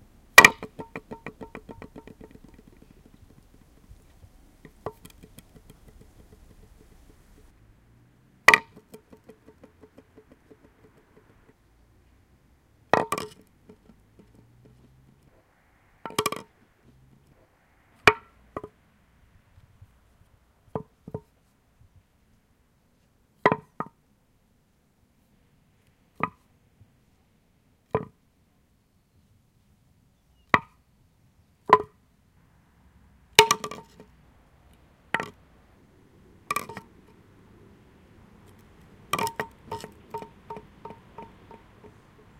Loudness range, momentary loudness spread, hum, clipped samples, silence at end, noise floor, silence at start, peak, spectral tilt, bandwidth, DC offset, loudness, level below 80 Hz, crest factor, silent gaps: 20 LU; 28 LU; none; under 0.1%; 1.15 s; -66 dBFS; 0.35 s; 0 dBFS; -2 dB/octave; 16 kHz; under 0.1%; -23 LUFS; -58 dBFS; 32 dB; none